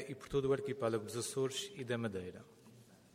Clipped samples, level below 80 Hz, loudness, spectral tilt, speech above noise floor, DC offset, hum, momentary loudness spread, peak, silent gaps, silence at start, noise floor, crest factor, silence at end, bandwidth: under 0.1%; -66 dBFS; -39 LUFS; -4.5 dB/octave; 23 dB; under 0.1%; none; 10 LU; -22 dBFS; none; 0 s; -61 dBFS; 18 dB; 0.2 s; 16 kHz